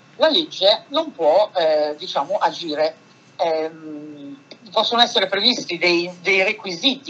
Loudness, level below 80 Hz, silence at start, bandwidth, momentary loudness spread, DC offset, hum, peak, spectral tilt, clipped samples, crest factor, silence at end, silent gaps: -19 LUFS; -84 dBFS; 0.2 s; 8 kHz; 12 LU; under 0.1%; none; 0 dBFS; -3 dB/octave; under 0.1%; 20 dB; 0 s; none